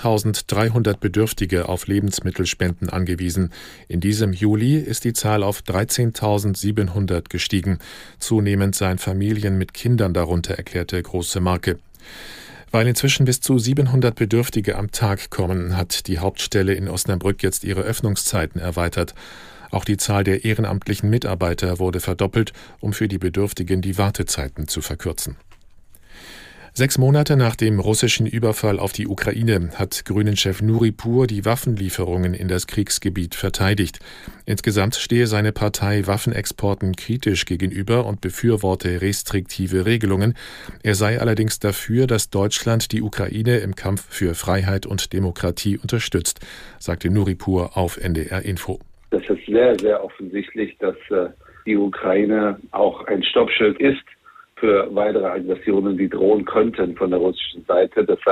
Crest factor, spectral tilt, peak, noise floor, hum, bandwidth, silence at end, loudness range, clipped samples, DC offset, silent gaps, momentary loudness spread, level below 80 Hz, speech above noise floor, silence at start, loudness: 16 dB; -5.5 dB/octave; -4 dBFS; -45 dBFS; none; 15.5 kHz; 0 s; 3 LU; under 0.1%; under 0.1%; none; 8 LU; -42 dBFS; 25 dB; 0 s; -20 LUFS